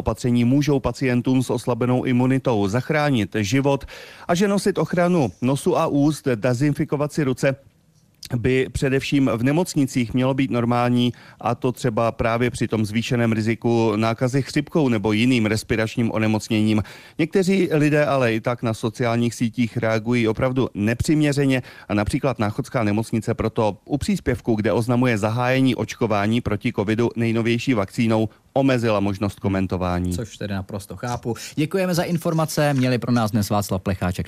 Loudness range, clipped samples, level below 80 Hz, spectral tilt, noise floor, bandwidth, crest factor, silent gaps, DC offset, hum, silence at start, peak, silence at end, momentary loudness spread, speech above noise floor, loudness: 2 LU; under 0.1%; -46 dBFS; -6.5 dB/octave; -58 dBFS; 15.5 kHz; 14 dB; none; under 0.1%; none; 0 s; -6 dBFS; 0 s; 6 LU; 37 dB; -21 LUFS